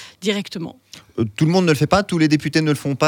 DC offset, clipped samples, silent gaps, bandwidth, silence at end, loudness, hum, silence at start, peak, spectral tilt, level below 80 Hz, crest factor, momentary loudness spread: under 0.1%; under 0.1%; none; 17.5 kHz; 0 s; -18 LUFS; none; 0 s; -2 dBFS; -6 dB/octave; -50 dBFS; 18 dB; 14 LU